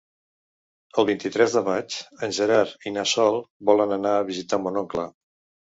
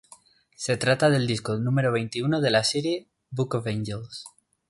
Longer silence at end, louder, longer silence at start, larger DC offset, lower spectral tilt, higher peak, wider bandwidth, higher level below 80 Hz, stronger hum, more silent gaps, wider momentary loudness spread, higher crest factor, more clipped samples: first, 0.55 s vs 0.4 s; about the same, -23 LUFS vs -25 LUFS; first, 0.95 s vs 0.6 s; neither; second, -3.5 dB/octave vs -5 dB/octave; first, -4 dBFS vs -8 dBFS; second, 8 kHz vs 11.5 kHz; about the same, -64 dBFS vs -60 dBFS; neither; first, 3.50-3.60 s vs none; second, 9 LU vs 13 LU; about the same, 20 dB vs 18 dB; neither